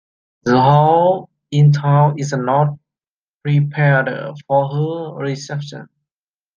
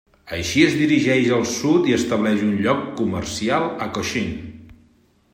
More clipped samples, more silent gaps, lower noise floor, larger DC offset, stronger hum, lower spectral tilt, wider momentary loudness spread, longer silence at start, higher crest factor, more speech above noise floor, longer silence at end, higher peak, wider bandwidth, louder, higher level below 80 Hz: neither; first, 3.10-3.41 s vs none; first, under -90 dBFS vs -58 dBFS; neither; neither; first, -7.5 dB/octave vs -5 dB/octave; first, 15 LU vs 10 LU; first, 0.45 s vs 0.25 s; about the same, 16 dB vs 18 dB; first, over 75 dB vs 38 dB; about the same, 0.7 s vs 0.6 s; about the same, -2 dBFS vs -2 dBFS; second, 7.2 kHz vs 16 kHz; first, -16 LUFS vs -20 LUFS; second, -58 dBFS vs -50 dBFS